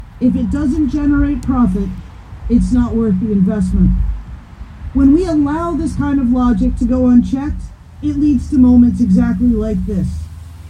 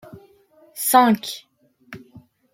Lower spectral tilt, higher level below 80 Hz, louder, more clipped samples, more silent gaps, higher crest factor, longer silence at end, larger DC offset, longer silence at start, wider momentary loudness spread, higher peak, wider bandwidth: first, -9 dB/octave vs -3.5 dB/octave; first, -24 dBFS vs -68 dBFS; first, -14 LUFS vs -18 LUFS; neither; neither; second, 14 dB vs 22 dB; second, 0 s vs 0.55 s; neither; second, 0 s vs 0.15 s; second, 13 LU vs 27 LU; about the same, 0 dBFS vs -2 dBFS; second, 9.8 kHz vs 16.5 kHz